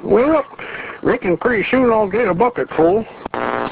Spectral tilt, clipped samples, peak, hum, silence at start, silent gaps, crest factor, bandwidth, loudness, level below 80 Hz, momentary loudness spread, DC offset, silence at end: -10 dB/octave; under 0.1%; -2 dBFS; none; 0 s; none; 16 dB; 4 kHz; -17 LUFS; -46 dBFS; 12 LU; under 0.1%; 0 s